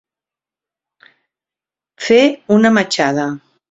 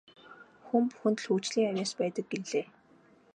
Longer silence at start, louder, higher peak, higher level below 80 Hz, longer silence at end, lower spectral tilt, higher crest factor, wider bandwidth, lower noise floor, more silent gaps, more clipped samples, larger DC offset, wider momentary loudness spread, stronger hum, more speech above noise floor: first, 2 s vs 0.25 s; first, -14 LUFS vs -31 LUFS; first, 0 dBFS vs -14 dBFS; first, -60 dBFS vs -82 dBFS; second, 0.35 s vs 0.7 s; about the same, -5 dB/octave vs -5 dB/octave; about the same, 18 dB vs 18 dB; second, 8 kHz vs 10.5 kHz; first, -89 dBFS vs -61 dBFS; neither; neither; neither; first, 13 LU vs 7 LU; neither; first, 76 dB vs 31 dB